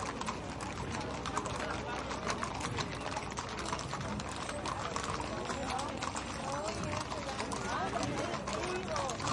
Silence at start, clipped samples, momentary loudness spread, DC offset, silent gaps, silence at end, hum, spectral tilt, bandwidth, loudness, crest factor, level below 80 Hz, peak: 0 s; under 0.1%; 3 LU; under 0.1%; none; 0 s; none; -4 dB/octave; 11.5 kHz; -37 LUFS; 20 dB; -52 dBFS; -18 dBFS